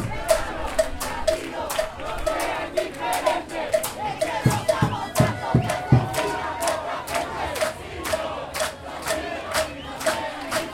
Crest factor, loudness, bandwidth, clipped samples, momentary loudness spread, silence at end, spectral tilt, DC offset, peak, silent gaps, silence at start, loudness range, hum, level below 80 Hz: 22 dB; -25 LUFS; 17 kHz; under 0.1%; 6 LU; 0 s; -4.5 dB/octave; under 0.1%; -4 dBFS; none; 0 s; 4 LU; none; -42 dBFS